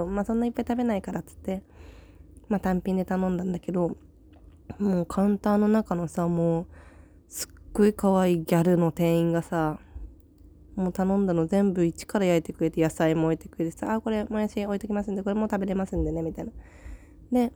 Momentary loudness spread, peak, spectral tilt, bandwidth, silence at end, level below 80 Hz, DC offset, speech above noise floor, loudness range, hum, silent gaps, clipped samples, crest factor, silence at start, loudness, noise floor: 12 LU; -10 dBFS; -7.5 dB/octave; over 20 kHz; 0.05 s; -46 dBFS; under 0.1%; 26 dB; 5 LU; none; none; under 0.1%; 16 dB; 0 s; -26 LUFS; -52 dBFS